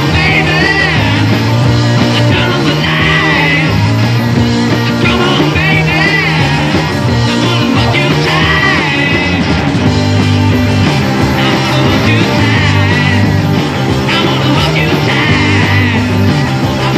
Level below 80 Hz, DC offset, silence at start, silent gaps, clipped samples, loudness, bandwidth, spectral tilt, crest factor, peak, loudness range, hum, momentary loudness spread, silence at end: -28 dBFS; under 0.1%; 0 s; none; under 0.1%; -10 LUFS; 14.5 kHz; -5.5 dB/octave; 10 dB; 0 dBFS; 1 LU; none; 3 LU; 0 s